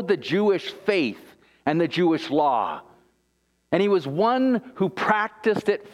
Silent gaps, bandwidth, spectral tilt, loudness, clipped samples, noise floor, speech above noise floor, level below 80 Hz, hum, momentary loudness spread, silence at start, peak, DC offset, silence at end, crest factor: none; 12 kHz; -6.5 dB/octave; -23 LUFS; under 0.1%; -69 dBFS; 47 dB; -68 dBFS; none; 6 LU; 0 s; -4 dBFS; under 0.1%; 0.05 s; 18 dB